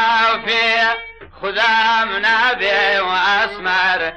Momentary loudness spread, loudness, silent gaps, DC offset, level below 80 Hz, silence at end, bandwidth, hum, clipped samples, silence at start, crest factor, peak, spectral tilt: 6 LU; -15 LUFS; none; under 0.1%; -48 dBFS; 0 s; 9 kHz; none; under 0.1%; 0 s; 10 dB; -6 dBFS; -2 dB/octave